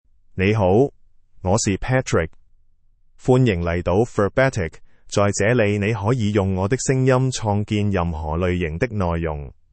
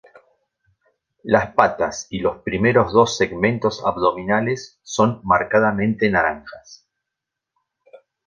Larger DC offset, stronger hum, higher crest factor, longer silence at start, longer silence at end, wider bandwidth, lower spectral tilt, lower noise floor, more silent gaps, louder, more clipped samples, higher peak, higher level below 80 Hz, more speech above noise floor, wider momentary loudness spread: neither; neither; about the same, 16 dB vs 20 dB; second, 0.35 s vs 1.25 s; about the same, 0.25 s vs 0.3 s; about the same, 8.8 kHz vs 9.6 kHz; about the same, -6 dB/octave vs -5.5 dB/octave; second, -54 dBFS vs -83 dBFS; neither; about the same, -20 LUFS vs -19 LUFS; neither; second, -4 dBFS vs 0 dBFS; first, -40 dBFS vs -48 dBFS; second, 35 dB vs 64 dB; about the same, 8 LU vs 9 LU